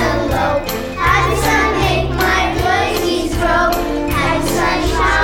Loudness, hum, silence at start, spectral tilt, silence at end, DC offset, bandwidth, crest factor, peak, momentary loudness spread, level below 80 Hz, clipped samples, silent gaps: -15 LUFS; none; 0 s; -4.5 dB/octave; 0 s; under 0.1%; 19 kHz; 14 dB; -2 dBFS; 4 LU; -24 dBFS; under 0.1%; none